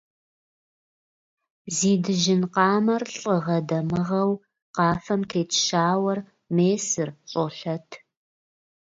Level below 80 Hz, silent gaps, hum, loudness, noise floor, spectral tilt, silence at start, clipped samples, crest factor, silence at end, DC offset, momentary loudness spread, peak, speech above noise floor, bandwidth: -62 dBFS; 4.62-4.74 s; none; -24 LUFS; under -90 dBFS; -4.5 dB/octave; 1.65 s; under 0.1%; 20 dB; 0.85 s; under 0.1%; 9 LU; -6 dBFS; over 67 dB; 8 kHz